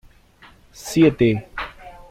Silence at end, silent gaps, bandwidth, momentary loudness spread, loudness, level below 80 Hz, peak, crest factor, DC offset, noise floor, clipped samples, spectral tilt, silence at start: 0.2 s; none; 15.5 kHz; 18 LU; -18 LUFS; -46 dBFS; -4 dBFS; 18 dB; under 0.1%; -50 dBFS; under 0.1%; -6.5 dB/octave; 0.8 s